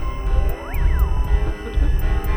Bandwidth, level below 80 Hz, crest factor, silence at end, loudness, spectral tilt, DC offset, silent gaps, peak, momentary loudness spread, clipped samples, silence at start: over 20 kHz; -18 dBFS; 12 dB; 0 s; -23 LUFS; -7 dB/octave; under 0.1%; none; -6 dBFS; 3 LU; under 0.1%; 0 s